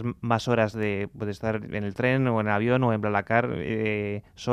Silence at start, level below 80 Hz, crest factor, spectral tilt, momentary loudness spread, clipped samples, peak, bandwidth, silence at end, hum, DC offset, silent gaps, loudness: 0 s; -56 dBFS; 18 dB; -7 dB/octave; 8 LU; under 0.1%; -8 dBFS; 11 kHz; 0 s; none; under 0.1%; none; -26 LUFS